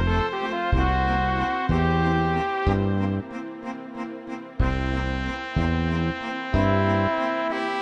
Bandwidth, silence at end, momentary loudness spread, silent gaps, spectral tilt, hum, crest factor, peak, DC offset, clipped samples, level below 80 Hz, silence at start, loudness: 8.6 kHz; 0 s; 13 LU; none; -7.5 dB/octave; none; 16 dB; -8 dBFS; under 0.1%; under 0.1%; -32 dBFS; 0 s; -24 LUFS